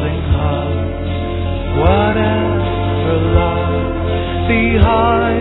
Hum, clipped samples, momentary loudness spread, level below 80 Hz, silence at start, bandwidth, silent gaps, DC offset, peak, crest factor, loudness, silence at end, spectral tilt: none; under 0.1%; 8 LU; -22 dBFS; 0 s; 4.1 kHz; none; under 0.1%; 0 dBFS; 14 dB; -15 LUFS; 0 s; -11 dB/octave